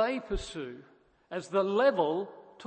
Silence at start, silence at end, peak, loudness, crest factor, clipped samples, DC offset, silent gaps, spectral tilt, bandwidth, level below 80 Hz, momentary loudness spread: 0 s; 0 s; -14 dBFS; -30 LUFS; 18 dB; under 0.1%; under 0.1%; none; -5.5 dB/octave; 8.8 kHz; -48 dBFS; 18 LU